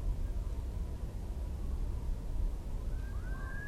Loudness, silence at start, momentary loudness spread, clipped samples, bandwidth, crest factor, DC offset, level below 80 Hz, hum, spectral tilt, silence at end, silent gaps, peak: -41 LUFS; 0 s; 2 LU; under 0.1%; 13.5 kHz; 12 dB; under 0.1%; -36 dBFS; none; -7 dB/octave; 0 s; none; -24 dBFS